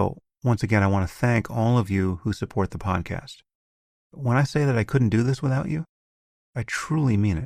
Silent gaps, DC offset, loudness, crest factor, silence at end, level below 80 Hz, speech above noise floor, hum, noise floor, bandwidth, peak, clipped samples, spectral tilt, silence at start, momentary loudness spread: 3.55-4.10 s, 5.89-6.53 s; under 0.1%; -24 LUFS; 16 dB; 0 s; -48 dBFS; over 67 dB; none; under -90 dBFS; 13.5 kHz; -6 dBFS; under 0.1%; -7.5 dB/octave; 0 s; 10 LU